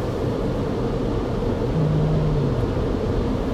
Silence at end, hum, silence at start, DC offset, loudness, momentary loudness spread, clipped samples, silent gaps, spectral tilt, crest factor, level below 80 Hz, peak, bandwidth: 0 s; none; 0 s; under 0.1%; -23 LUFS; 4 LU; under 0.1%; none; -8.5 dB/octave; 12 dB; -30 dBFS; -10 dBFS; 10 kHz